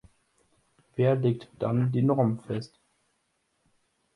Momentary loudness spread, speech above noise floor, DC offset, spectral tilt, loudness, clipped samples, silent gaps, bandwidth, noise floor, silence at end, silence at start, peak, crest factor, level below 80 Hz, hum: 11 LU; 49 dB; under 0.1%; -9.5 dB/octave; -27 LUFS; under 0.1%; none; 10.5 kHz; -75 dBFS; 1.5 s; 0.95 s; -12 dBFS; 18 dB; -66 dBFS; none